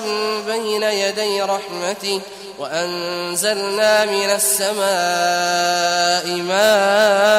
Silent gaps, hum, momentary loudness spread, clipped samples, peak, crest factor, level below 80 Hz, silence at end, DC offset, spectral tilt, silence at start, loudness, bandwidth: none; none; 9 LU; under 0.1%; -2 dBFS; 16 dB; -66 dBFS; 0 s; under 0.1%; -1.5 dB/octave; 0 s; -17 LUFS; 16 kHz